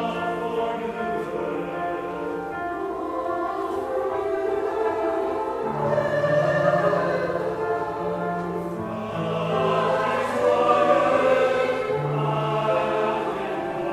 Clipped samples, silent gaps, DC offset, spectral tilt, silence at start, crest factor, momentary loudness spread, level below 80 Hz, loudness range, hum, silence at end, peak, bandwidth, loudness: under 0.1%; none; under 0.1%; -6.5 dB/octave; 0 s; 18 dB; 9 LU; -54 dBFS; 7 LU; none; 0 s; -6 dBFS; 15 kHz; -24 LUFS